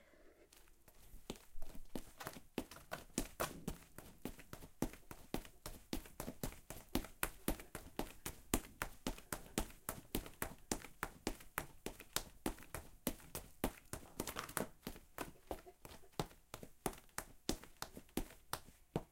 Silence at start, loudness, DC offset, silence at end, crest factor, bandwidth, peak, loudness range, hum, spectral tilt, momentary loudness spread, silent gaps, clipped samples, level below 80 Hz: 0 s; -47 LUFS; under 0.1%; 0 s; 36 dB; 17 kHz; -12 dBFS; 4 LU; none; -3.5 dB/octave; 12 LU; none; under 0.1%; -56 dBFS